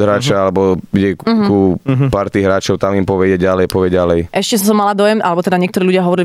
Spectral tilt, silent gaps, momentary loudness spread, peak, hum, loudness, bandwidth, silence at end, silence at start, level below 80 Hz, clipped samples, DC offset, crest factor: -6 dB/octave; none; 3 LU; -2 dBFS; none; -13 LUFS; 16 kHz; 0 s; 0 s; -40 dBFS; under 0.1%; under 0.1%; 10 dB